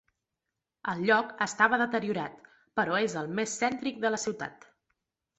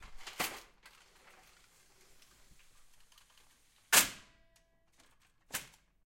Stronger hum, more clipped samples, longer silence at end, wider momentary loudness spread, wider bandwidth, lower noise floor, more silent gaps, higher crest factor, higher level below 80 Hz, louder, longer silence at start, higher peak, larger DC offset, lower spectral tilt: neither; neither; first, 0.85 s vs 0.4 s; second, 12 LU vs 25 LU; second, 8.2 kHz vs 16.5 kHz; first, -87 dBFS vs -70 dBFS; neither; second, 22 dB vs 30 dB; second, -72 dBFS vs -66 dBFS; about the same, -29 LUFS vs -31 LUFS; first, 0.85 s vs 0 s; about the same, -8 dBFS vs -10 dBFS; neither; first, -3.5 dB/octave vs 0.5 dB/octave